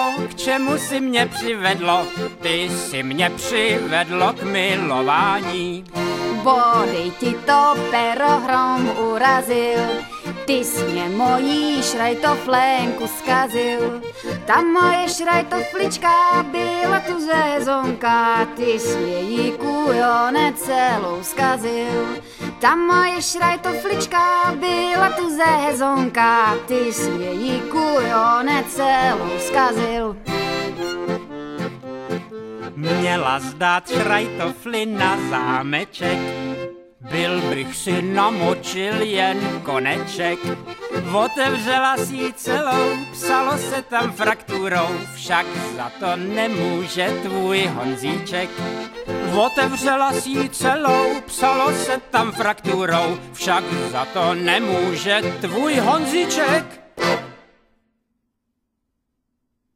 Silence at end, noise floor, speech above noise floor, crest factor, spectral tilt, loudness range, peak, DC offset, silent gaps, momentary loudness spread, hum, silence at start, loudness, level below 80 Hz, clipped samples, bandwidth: 2.4 s; -75 dBFS; 56 dB; 18 dB; -4 dB/octave; 4 LU; -2 dBFS; under 0.1%; none; 9 LU; none; 0 s; -19 LUFS; -54 dBFS; under 0.1%; 16 kHz